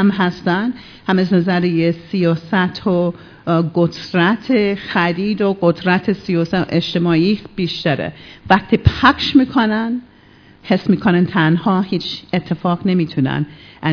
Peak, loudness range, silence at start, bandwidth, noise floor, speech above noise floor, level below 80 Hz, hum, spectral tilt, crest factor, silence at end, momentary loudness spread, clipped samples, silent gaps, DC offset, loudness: 0 dBFS; 2 LU; 0 s; 5.4 kHz; -46 dBFS; 30 dB; -40 dBFS; none; -7.5 dB/octave; 16 dB; 0 s; 8 LU; under 0.1%; none; under 0.1%; -17 LUFS